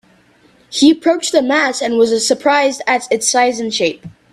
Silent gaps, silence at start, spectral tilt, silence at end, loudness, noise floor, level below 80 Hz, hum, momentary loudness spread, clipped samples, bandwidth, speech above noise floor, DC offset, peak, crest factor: none; 0.7 s; -2 dB/octave; 0.25 s; -14 LUFS; -50 dBFS; -60 dBFS; none; 6 LU; under 0.1%; 13.5 kHz; 37 dB; under 0.1%; 0 dBFS; 14 dB